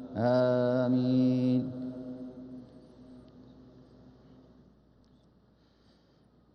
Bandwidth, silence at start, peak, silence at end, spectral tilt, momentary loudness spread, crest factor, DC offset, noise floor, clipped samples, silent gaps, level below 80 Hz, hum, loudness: 6 kHz; 0 s; -16 dBFS; 3.15 s; -9.5 dB/octave; 22 LU; 18 dB; under 0.1%; -64 dBFS; under 0.1%; none; -68 dBFS; none; -29 LUFS